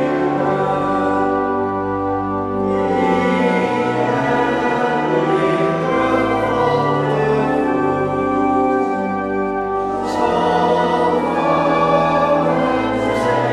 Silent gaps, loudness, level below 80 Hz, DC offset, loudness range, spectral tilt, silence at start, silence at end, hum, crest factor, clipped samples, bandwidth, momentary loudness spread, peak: none; -17 LUFS; -44 dBFS; under 0.1%; 2 LU; -7 dB/octave; 0 s; 0 s; none; 12 dB; under 0.1%; 12 kHz; 5 LU; -4 dBFS